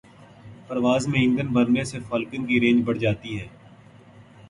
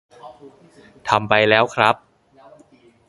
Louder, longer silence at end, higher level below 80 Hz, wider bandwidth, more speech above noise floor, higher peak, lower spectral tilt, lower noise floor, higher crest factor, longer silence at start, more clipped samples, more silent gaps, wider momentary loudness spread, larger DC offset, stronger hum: second, -23 LUFS vs -17 LUFS; second, 0.25 s vs 1.15 s; about the same, -54 dBFS vs -56 dBFS; about the same, 11 kHz vs 11.5 kHz; second, 27 dB vs 33 dB; second, -8 dBFS vs 0 dBFS; first, -6 dB/octave vs -4.5 dB/octave; about the same, -49 dBFS vs -52 dBFS; second, 16 dB vs 22 dB; about the same, 0.2 s vs 0.25 s; neither; neither; about the same, 12 LU vs 11 LU; neither; neither